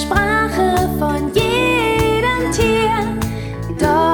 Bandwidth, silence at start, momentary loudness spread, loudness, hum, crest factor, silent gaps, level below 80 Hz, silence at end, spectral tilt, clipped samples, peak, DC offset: 19 kHz; 0 s; 7 LU; -16 LUFS; none; 14 dB; none; -30 dBFS; 0 s; -5 dB/octave; under 0.1%; -2 dBFS; under 0.1%